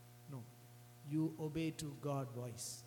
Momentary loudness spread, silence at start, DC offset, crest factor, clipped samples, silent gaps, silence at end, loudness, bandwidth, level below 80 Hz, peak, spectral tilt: 17 LU; 0 s; under 0.1%; 14 dB; under 0.1%; none; 0 s; -44 LUFS; 19 kHz; -72 dBFS; -30 dBFS; -5.5 dB/octave